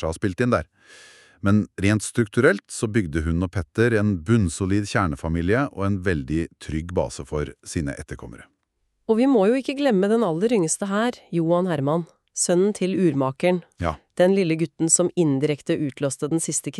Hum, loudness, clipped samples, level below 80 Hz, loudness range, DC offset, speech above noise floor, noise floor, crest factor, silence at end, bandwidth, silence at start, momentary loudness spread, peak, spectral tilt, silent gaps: none; -22 LUFS; under 0.1%; -42 dBFS; 4 LU; under 0.1%; 50 dB; -72 dBFS; 18 dB; 0 s; 13 kHz; 0 s; 10 LU; -4 dBFS; -5.5 dB/octave; none